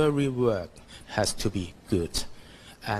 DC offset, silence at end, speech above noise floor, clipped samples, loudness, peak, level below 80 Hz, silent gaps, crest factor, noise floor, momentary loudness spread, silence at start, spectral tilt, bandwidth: under 0.1%; 0 s; 20 dB; under 0.1%; -29 LUFS; -10 dBFS; -44 dBFS; none; 18 dB; -48 dBFS; 20 LU; 0 s; -5 dB/octave; 13 kHz